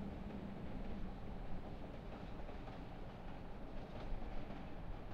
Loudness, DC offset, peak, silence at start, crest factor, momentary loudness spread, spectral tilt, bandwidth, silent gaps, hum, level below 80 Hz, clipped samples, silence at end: -51 LUFS; under 0.1%; -30 dBFS; 0 s; 14 dB; 4 LU; -8 dB/octave; 6.4 kHz; none; none; -50 dBFS; under 0.1%; 0 s